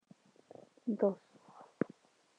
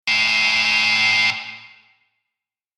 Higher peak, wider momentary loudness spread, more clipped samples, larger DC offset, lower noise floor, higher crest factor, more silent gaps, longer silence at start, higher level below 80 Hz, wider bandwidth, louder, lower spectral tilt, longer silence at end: second, -16 dBFS vs -6 dBFS; first, 25 LU vs 10 LU; neither; neither; second, -65 dBFS vs -85 dBFS; first, 24 dB vs 14 dB; neither; first, 0.85 s vs 0.05 s; second, -88 dBFS vs -64 dBFS; second, 9.2 kHz vs 15.5 kHz; second, -38 LUFS vs -15 LUFS; first, -9 dB/octave vs 0 dB/octave; second, 0.75 s vs 1.1 s